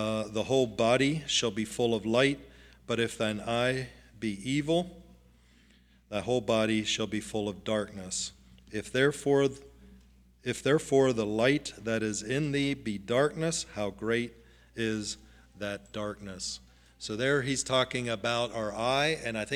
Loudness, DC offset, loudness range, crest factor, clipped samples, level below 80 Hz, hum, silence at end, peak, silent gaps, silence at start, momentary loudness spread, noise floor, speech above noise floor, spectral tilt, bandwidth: -30 LUFS; under 0.1%; 5 LU; 20 dB; under 0.1%; -58 dBFS; none; 0 s; -10 dBFS; none; 0 s; 12 LU; -61 dBFS; 32 dB; -4 dB/octave; 15 kHz